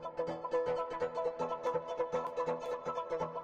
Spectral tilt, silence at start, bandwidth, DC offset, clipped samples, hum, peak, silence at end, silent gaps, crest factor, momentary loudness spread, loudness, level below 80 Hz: -6 dB/octave; 0 s; 8.2 kHz; under 0.1%; under 0.1%; none; -24 dBFS; 0 s; none; 14 dB; 3 LU; -37 LUFS; -68 dBFS